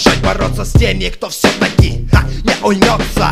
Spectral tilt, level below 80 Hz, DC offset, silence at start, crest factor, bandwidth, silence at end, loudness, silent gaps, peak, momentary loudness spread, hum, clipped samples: -5 dB/octave; -18 dBFS; under 0.1%; 0 s; 12 dB; 16 kHz; 0 s; -13 LUFS; none; 0 dBFS; 5 LU; none; 0.4%